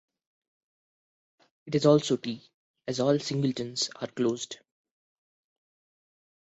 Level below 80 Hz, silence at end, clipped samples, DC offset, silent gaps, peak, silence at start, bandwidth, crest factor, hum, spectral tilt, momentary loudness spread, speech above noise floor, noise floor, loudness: -72 dBFS; 2 s; under 0.1%; under 0.1%; 2.54-2.74 s; -10 dBFS; 1.65 s; 8.2 kHz; 22 dB; none; -5.5 dB/octave; 17 LU; over 63 dB; under -90 dBFS; -28 LUFS